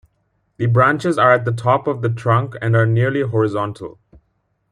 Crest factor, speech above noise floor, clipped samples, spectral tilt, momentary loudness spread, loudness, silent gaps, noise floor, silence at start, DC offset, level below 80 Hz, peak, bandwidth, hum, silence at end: 16 dB; 50 dB; under 0.1%; -8 dB/octave; 10 LU; -17 LUFS; none; -67 dBFS; 0.6 s; under 0.1%; -56 dBFS; -2 dBFS; 10.5 kHz; none; 0.8 s